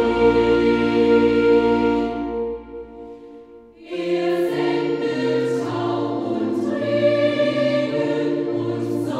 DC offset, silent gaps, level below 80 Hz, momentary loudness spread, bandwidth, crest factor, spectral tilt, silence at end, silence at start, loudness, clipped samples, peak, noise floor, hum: under 0.1%; none; -46 dBFS; 13 LU; 11.5 kHz; 14 dB; -7 dB/octave; 0 s; 0 s; -20 LUFS; under 0.1%; -6 dBFS; -43 dBFS; none